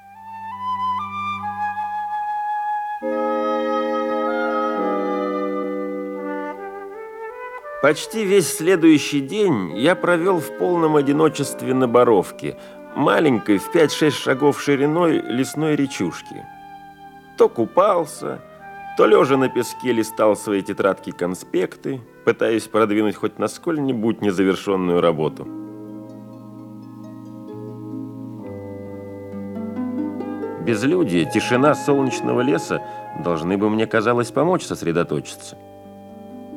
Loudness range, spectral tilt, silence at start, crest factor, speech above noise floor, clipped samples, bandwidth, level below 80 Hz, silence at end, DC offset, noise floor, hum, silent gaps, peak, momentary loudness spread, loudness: 8 LU; -5.5 dB/octave; 0.05 s; 18 dB; 23 dB; under 0.1%; 16.5 kHz; -64 dBFS; 0 s; under 0.1%; -42 dBFS; none; none; -2 dBFS; 18 LU; -20 LUFS